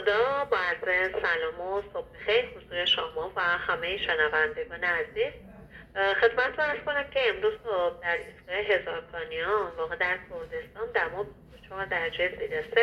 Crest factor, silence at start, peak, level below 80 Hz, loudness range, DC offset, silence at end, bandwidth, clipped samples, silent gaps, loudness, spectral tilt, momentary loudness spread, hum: 20 dB; 0 s; -10 dBFS; -56 dBFS; 3 LU; under 0.1%; 0 s; 10 kHz; under 0.1%; none; -28 LUFS; -4 dB/octave; 11 LU; none